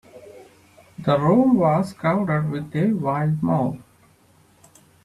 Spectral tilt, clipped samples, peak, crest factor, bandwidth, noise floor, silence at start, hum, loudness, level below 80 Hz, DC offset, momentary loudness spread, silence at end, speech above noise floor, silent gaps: -8.5 dB/octave; under 0.1%; -6 dBFS; 16 dB; 12 kHz; -56 dBFS; 0.15 s; none; -21 LUFS; -56 dBFS; under 0.1%; 9 LU; 1.25 s; 36 dB; none